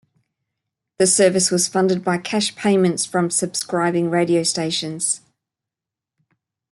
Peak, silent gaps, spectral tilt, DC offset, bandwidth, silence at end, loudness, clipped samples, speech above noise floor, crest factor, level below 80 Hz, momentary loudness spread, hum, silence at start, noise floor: -4 dBFS; none; -3.5 dB/octave; under 0.1%; 12.5 kHz; 1.55 s; -19 LUFS; under 0.1%; 68 dB; 18 dB; -66 dBFS; 7 LU; none; 1 s; -87 dBFS